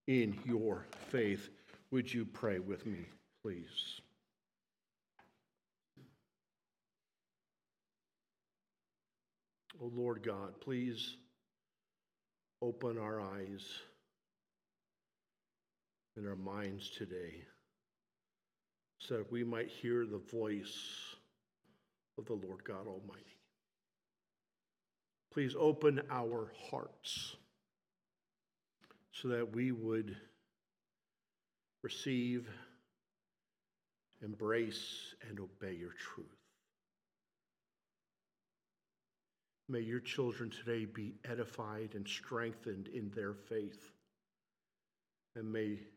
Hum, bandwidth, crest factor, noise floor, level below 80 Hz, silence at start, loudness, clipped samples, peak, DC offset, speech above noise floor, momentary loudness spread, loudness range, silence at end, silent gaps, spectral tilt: none; 16 kHz; 24 dB; under -90 dBFS; -86 dBFS; 0.05 s; -42 LUFS; under 0.1%; -20 dBFS; under 0.1%; over 49 dB; 15 LU; 12 LU; 0.05 s; none; -5.5 dB/octave